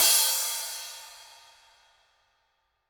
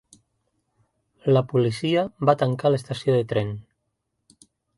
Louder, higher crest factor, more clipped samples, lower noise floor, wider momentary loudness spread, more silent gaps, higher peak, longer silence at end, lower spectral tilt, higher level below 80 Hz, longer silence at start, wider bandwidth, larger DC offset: about the same, -24 LUFS vs -23 LUFS; about the same, 24 dB vs 20 dB; neither; about the same, -74 dBFS vs -77 dBFS; first, 25 LU vs 8 LU; neither; about the same, -6 dBFS vs -4 dBFS; first, 1.65 s vs 1.15 s; second, 4 dB/octave vs -7.5 dB/octave; second, -74 dBFS vs -60 dBFS; second, 0 s vs 1.25 s; first, over 20 kHz vs 11.5 kHz; neither